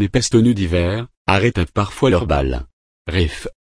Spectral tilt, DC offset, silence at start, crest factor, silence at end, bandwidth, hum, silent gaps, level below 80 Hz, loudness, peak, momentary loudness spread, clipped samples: -5.5 dB/octave; under 0.1%; 0 s; 16 dB; 0.15 s; 11 kHz; none; 1.17-1.25 s, 2.73-3.05 s; -30 dBFS; -18 LUFS; -2 dBFS; 9 LU; under 0.1%